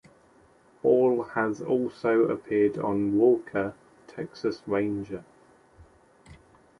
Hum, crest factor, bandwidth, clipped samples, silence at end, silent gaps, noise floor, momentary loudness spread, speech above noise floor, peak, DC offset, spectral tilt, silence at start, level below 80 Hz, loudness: none; 16 dB; 10.5 kHz; under 0.1%; 0.45 s; none; -59 dBFS; 15 LU; 34 dB; -10 dBFS; under 0.1%; -8 dB/octave; 0.85 s; -62 dBFS; -26 LUFS